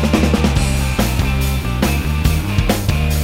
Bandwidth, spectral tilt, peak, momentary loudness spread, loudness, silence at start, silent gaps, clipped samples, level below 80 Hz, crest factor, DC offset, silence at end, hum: 16.5 kHz; -5.5 dB/octave; -2 dBFS; 3 LU; -17 LUFS; 0 s; none; under 0.1%; -20 dBFS; 14 dB; under 0.1%; 0 s; none